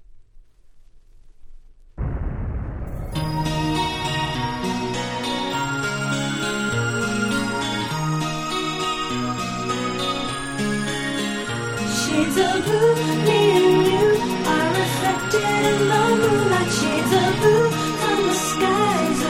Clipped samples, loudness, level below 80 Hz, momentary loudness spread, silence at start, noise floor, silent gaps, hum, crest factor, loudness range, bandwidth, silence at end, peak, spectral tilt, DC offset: under 0.1%; -21 LUFS; -40 dBFS; 8 LU; 0 s; -47 dBFS; none; none; 16 dB; 7 LU; 16 kHz; 0 s; -6 dBFS; -4.5 dB/octave; under 0.1%